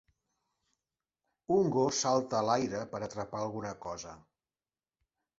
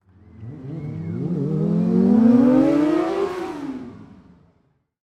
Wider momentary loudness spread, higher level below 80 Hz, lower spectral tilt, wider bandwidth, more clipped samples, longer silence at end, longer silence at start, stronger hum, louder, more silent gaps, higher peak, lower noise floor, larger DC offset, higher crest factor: second, 14 LU vs 21 LU; second, -68 dBFS vs -54 dBFS; second, -4.5 dB/octave vs -9 dB/octave; about the same, 8 kHz vs 8.4 kHz; neither; first, 1.2 s vs 0.9 s; first, 1.5 s vs 0.4 s; neither; second, -32 LUFS vs -19 LUFS; neither; second, -14 dBFS vs -6 dBFS; first, under -90 dBFS vs -64 dBFS; neither; about the same, 20 dB vs 16 dB